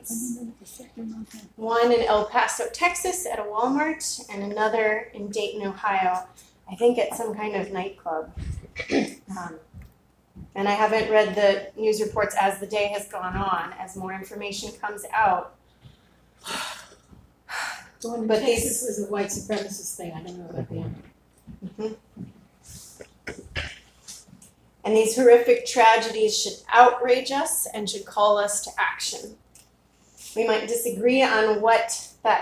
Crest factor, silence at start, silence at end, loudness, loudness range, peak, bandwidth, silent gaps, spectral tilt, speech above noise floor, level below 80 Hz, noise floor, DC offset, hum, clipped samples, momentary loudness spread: 24 dB; 0.05 s; 0 s; -24 LUFS; 12 LU; 0 dBFS; 16 kHz; none; -3 dB/octave; 36 dB; -52 dBFS; -59 dBFS; under 0.1%; none; under 0.1%; 20 LU